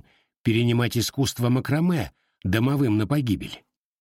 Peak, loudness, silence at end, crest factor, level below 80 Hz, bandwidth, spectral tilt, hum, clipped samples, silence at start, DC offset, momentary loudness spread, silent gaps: -8 dBFS; -24 LUFS; 0.4 s; 16 dB; -50 dBFS; 16.5 kHz; -6 dB/octave; none; under 0.1%; 0.45 s; under 0.1%; 10 LU; none